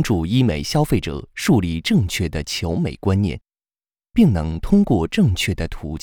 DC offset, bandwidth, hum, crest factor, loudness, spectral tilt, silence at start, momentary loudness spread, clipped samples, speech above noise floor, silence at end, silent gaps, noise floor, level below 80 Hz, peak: under 0.1%; 19.5 kHz; none; 16 dB; -20 LUFS; -6 dB/octave; 0 s; 7 LU; under 0.1%; over 71 dB; 0.05 s; none; under -90 dBFS; -36 dBFS; -4 dBFS